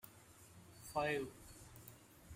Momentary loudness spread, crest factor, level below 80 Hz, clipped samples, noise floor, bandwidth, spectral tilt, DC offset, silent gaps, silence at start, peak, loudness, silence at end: 22 LU; 22 dB; -68 dBFS; under 0.1%; -62 dBFS; 16 kHz; -4.5 dB/octave; under 0.1%; none; 0.05 s; -26 dBFS; -42 LUFS; 0 s